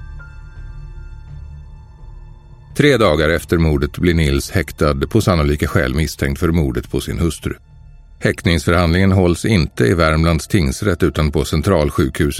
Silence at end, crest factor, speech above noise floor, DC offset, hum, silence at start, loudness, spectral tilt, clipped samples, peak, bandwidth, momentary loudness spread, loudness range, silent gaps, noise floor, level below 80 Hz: 0 s; 16 dB; 25 dB; under 0.1%; none; 0 s; -16 LUFS; -6 dB/octave; under 0.1%; 0 dBFS; 16 kHz; 22 LU; 4 LU; none; -40 dBFS; -26 dBFS